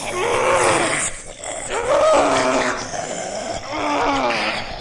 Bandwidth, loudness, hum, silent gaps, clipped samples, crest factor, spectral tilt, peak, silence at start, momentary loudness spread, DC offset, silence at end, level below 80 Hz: 11.5 kHz; -19 LUFS; none; none; under 0.1%; 16 dB; -2.5 dB/octave; -4 dBFS; 0 s; 11 LU; under 0.1%; 0 s; -42 dBFS